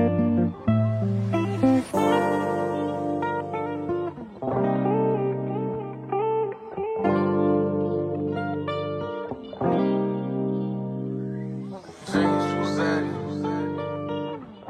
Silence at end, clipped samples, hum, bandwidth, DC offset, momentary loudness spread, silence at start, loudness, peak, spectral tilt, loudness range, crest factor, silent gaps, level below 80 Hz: 0 s; under 0.1%; none; 14 kHz; under 0.1%; 9 LU; 0 s; -26 LUFS; -8 dBFS; -8 dB/octave; 3 LU; 18 dB; none; -60 dBFS